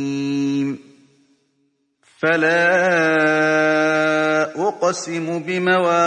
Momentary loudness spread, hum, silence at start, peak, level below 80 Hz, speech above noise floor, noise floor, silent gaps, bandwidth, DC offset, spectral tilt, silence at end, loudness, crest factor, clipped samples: 9 LU; none; 0 s; -4 dBFS; -70 dBFS; 49 dB; -66 dBFS; none; 10.5 kHz; under 0.1%; -5 dB/octave; 0 s; -18 LUFS; 14 dB; under 0.1%